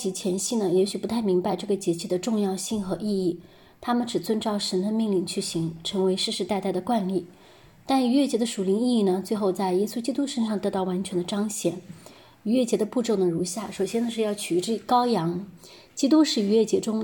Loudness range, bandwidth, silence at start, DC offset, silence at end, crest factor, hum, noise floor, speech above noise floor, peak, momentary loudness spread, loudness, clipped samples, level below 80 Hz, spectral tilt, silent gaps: 3 LU; 17.5 kHz; 0 s; under 0.1%; 0 s; 16 dB; none; -52 dBFS; 28 dB; -8 dBFS; 7 LU; -25 LUFS; under 0.1%; -64 dBFS; -5 dB/octave; none